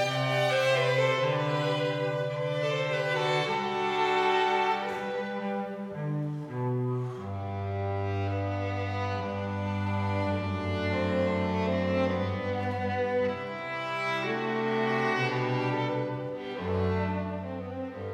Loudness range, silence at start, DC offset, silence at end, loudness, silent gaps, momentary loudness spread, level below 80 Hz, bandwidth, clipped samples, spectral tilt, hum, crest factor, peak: 5 LU; 0 s; under 0.1%; 0 s; -29 LUFS; none; 9 LU; -70 dBFS; 12.5 kHz; under 0.1%; -6.5 dB/octave; none; 16 dB; -14 dBFS